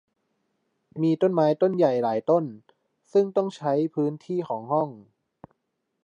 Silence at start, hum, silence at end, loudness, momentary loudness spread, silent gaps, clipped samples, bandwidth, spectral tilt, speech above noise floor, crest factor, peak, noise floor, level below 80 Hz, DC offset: 0.95 s; none; 1 s; -24 LUFS; 8 LU; none; under 0.1%; 8.4 kHz; -8.5 dB/octave; 55 dB; 16 dB; -8 dBFS; -78 dBFS; -78 dBFS; under 0.1%